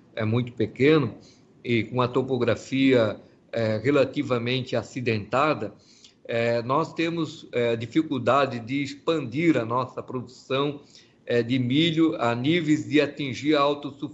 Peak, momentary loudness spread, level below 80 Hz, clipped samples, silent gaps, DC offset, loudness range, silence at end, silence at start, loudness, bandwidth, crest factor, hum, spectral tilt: -8 dBFS; 9 LU; -64 dBFS; under 0.1%; none; under 0.1%; 2 LU; 0 s; 0.15 s; -25 LUFS; 8 kHz; 18 dB; none; -6.5 dB/octave